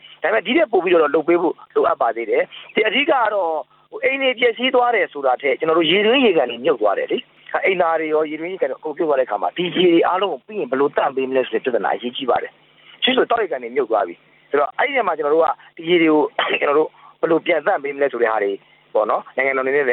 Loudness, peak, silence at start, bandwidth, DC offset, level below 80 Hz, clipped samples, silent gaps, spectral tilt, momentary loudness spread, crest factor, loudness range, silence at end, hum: -19 LUFS; -4 dBFS; 0.05 s; 4.2 kHz; under 0.1%; -68 dBFS; under 0.1%; none; -8 dB/octave; 8 LU; 14 dB; 3 LU; 0 s; none